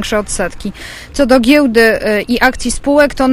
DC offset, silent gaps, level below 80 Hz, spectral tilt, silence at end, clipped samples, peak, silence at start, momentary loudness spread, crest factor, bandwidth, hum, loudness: under 0.1%; none; -32 dBFS; -4 dB/octave; 0 s; 0.2%; 0 dBFS; 0 s; 15 LU; 12 dB; 15.5 kHz; none; -11 LUFS